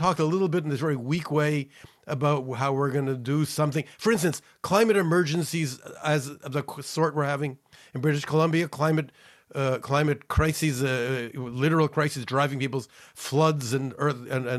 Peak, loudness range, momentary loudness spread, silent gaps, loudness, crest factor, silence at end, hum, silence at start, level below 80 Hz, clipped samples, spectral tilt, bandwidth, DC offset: -8 dBFS; 2 LU; 9 LU; none; -26 LUFS; 18 dB; 0 s; none; 0 s; -48 dBFS; under 0.1%; -6 dB/octave; 14 kHz; under 0.1%